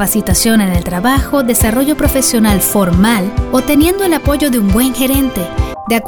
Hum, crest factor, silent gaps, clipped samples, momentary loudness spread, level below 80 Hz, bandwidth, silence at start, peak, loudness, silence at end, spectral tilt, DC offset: none; 10 dB; none; under 0.1%; 4 LU; -22 dBFS; over 20 kHz; 0 s; 0 dBFS; -12 LUFS; 0 s; -4.5 dB/octave; under 0.1%